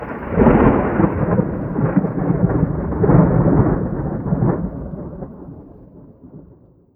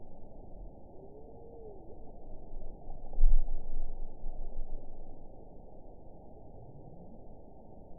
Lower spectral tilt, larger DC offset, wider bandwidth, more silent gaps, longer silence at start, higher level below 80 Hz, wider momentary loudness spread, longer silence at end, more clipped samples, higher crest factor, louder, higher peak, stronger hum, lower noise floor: about the same, -13 dB/octave vs -14 dB/octave; second, under 0.1% vs 0.3%; first, 3.2 kHz vs 1 kHz; neither; about the same, 0 s vs 0 s; about the same, -30 dBFS vs -34 dBFS; about the same, 17 LU vs 18 LU; first, 0.55 s vs 0 s; neither; about the same, 18 dB vs 20 dB; first, -17 LUFS vs -45 LUFS; first, 0 dBFS vs -10 dBFS; neither; second, -48 dBFS vs -52 dBFS